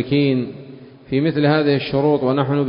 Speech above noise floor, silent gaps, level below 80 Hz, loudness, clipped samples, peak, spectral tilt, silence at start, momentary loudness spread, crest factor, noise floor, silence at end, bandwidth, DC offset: 22 dB; none; -54 dBFS; -18 LUFS; under 0.1%; -4 dBFS; -12 dB/octave; 0 s; 8 LU; 14 dB; -39 dBFS; 0 s; 5.4 kHz; under 0.1%